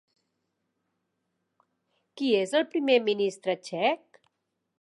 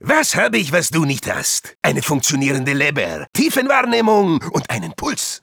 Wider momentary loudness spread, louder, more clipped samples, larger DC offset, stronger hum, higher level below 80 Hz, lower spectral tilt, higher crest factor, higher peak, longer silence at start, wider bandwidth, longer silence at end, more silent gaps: about the same, 8 LU vs 7 LU; second, -27 LUFS vs -17 LUFS; neither; neither; neither; second, -86 dBFS vs -52 dBFS; about the same, -4.5 dB/octave vs -3.5 dB/octave; about the same, 20 dB vs 16 dB; second, -10 dBFS vs 0 dBFS; first, 2.15 s vs 0.05 s; second, 11.5 kHz vs over 20 kHz; first, 0.85 s vs 0.05 s; second, none vs 3.29-3.33 s